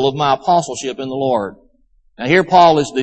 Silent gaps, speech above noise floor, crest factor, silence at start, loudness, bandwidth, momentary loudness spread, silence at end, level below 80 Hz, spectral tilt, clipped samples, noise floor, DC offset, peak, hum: none; 40 dB; 16 dB; 0 s; -15 LUFS; 8.8 kHz; 13 LU; 0 s; -52 dBFS; -5 dB/octave; under 0.1%; -54 dBFS; under 0.1%; 0 dBFS; none